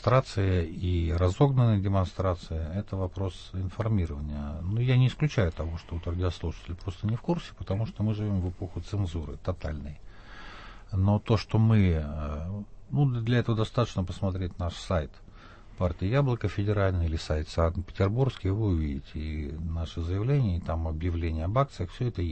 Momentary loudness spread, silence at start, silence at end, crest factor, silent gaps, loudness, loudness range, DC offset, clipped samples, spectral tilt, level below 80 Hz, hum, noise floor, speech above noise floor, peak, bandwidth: 12 LU; 0 s; 0 s; 18 dB; none; -29 LUFS; 5 LU; under 0.1%; under 0.1%; -8 dB/octave; -40 dBFS; none; -48 dBFS; 21 dB; -10 dBFS; 8.6 kHz